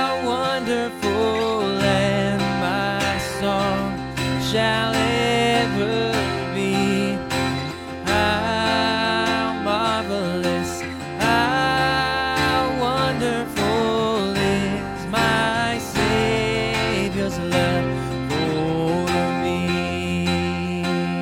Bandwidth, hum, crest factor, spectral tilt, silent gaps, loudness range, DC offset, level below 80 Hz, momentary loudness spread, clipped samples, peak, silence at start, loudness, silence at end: 17 kHz; none; 16 dB; -5 dB/octave; none; 1 LU; under 0.1%; -42 dBFS; 5 LU; under 0.1%; -4 dBFS; 0 s; -21 LUFS; 0 s